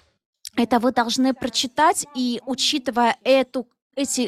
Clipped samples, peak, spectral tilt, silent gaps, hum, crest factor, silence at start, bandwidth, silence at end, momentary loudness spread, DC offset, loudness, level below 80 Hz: under 0.1%; -6 dBFS; -2 dB/octave; 3.82-3.90 s; none; 16 dB; 0.45 s; 14.5 kHz; 0 s; 10 LU; under 0.1%; -21 LUFS; -60 dBFS